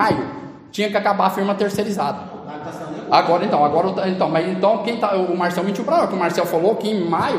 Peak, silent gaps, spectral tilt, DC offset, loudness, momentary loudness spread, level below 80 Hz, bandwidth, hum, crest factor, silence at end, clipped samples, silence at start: 0 dBFS; none; -6 dB/octave; under 0.1%; -19 LUFS; 14 LU; -58 dBFS; 15.5 kHz; none; 18 dB; 0 s; under 0.1%; 0 s